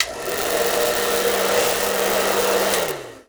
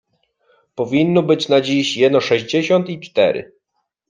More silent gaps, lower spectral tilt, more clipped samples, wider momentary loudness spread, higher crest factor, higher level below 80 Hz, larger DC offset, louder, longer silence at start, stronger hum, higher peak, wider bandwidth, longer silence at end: neither; second, -1.5 dB/octave vs -5.5 dB/octave; neither; second, 4 LU vs 8 LU; about the same, 20 dB vs 16 dB; first, -50 dBFS vs -62 dBFS; first, 0.2% vs under 0.1%; about the same, -19 LUFS vs -17 LUFS; second, 0 s vs 0.75 s; neither; about the same, 0 dBFS vs -2 dBFS; first, over 20 kHz vs 9.6 kHz; second, 0.05 s vs 0.65 s